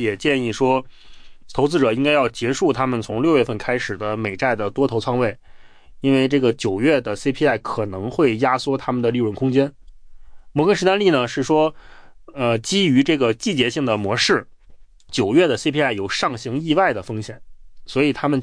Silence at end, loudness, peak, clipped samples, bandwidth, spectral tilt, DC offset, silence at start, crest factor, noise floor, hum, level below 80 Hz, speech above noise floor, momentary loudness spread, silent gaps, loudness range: 0 s; -19 LUFS; -4 dBFS; under 0.1%; 10.5 kHz; -5.5 dB/octave; under 0.1%; 0 s; 14 dB; -44 dBFS; none; -48 dBFS; 25 dB; 8 LU; none; 2 LU